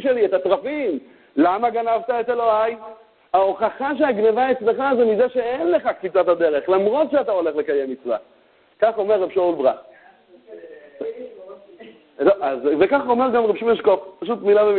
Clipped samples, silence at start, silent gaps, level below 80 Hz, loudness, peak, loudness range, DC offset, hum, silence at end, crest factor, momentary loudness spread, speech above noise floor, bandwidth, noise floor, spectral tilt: under 0.1%; 0 s; none; -62 dBFS; -20 LUFS; -2 dBFS; 5 LU; under 0.1%; none; 0 s; 18 dB; 10 LU; 31 dB; 4.5 kHz; -50 dBFS; -10 dB/octave